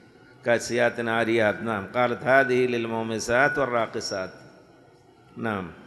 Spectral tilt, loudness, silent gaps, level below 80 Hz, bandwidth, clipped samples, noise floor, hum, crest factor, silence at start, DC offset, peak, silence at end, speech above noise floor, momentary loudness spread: -4.5 dB/octave; -24 LUFS; none; -60 dBFS; 12 kHz; under 0.1%; -54 dBFS; none; 20 dB; 0.45 s; under 0.1%; -6 dBFS; 0 s; 30 dB; 10 LU